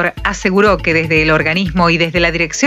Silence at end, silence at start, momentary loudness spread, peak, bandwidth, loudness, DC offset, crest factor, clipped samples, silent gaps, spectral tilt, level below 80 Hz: 0 s; 0 s; 3 LU; 0 dBFS; 14 kHz; -13 LUFS; under 0.1%; 12 dB; under 0.1%; none; -4.5 dB/octave; -30 dBFS